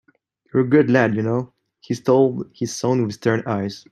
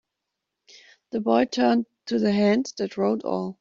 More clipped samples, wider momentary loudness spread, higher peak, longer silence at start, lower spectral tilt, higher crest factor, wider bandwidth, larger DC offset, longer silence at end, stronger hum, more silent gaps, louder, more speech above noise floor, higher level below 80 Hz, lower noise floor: neither; first, 11 LU vs 8 LU; first, -2 dBFS vs -6 dBFS; second, 0.55 s vs 1.15 s; about the same, -6.5 dB/octave vs -6 dB/octave; about the same, 18 dB vs 18 dB; first, 12.5 kHz vs 7.6 kHz; neither; about the same, 0.15 s vs 0.05 s; neither; neither; first, -20 LUFS vs -24 LUFS; second, 42 dB vs 60 dB; about the same, -62 dBFS vs -66 dBFS; second, -61 dBFS vs -83 dBFS